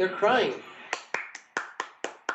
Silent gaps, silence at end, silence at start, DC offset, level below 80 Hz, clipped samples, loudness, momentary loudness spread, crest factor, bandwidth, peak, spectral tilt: none; 0 s; 0 s; under 0.1%; -80 dBFS; under 0.1%; -30 LUFS; 13 LU; 18 dB; 8.4 kHz; -12 dBFS; -3 dB/octave